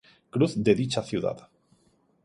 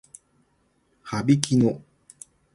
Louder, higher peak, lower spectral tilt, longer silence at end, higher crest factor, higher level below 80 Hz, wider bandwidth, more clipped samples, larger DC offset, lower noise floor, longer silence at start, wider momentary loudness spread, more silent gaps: second, -26 LUFS vs -22 LUFS; second, -8 dBFS vs -2 dBFS; about the same, -6.5 dB/octave vs -6 dB/octave; about the same, 0.85 s vs 0.75 s; about the same, 20 dB vs 24 dB; about the same, -60 dBFS vs -58 dBFS; about the same, 11.5 kHz vs 11.5 kHz; neither; neither; about the same, -66 dBFS vs -67 dBFS; second, 0.35 s vs 1.05 s; second, 11 LU vs 26 LU; neither